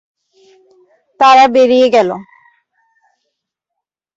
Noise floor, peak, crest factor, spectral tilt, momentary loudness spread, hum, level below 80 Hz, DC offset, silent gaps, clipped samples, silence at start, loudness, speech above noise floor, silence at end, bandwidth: -79 dBFS; 0 dBFS; 14 dB; -4 dB/octave; 11 LU; none; -62 dBFS; under 0.1%; none; under 0.1%; 1.2 s; -9 LUFS; 71 dB; 1.95 s; 7.8 kHz